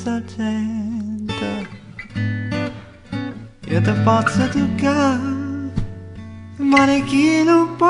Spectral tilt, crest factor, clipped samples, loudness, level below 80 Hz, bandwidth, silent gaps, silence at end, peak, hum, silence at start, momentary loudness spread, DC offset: -6.5 dB/octave; 18 dB; under 0.1%; -19 LUFS; -42 dBFS; 11 kHz; none; 0 s; 0 dBFS; none; 0 s; 19 LU; under 0.1%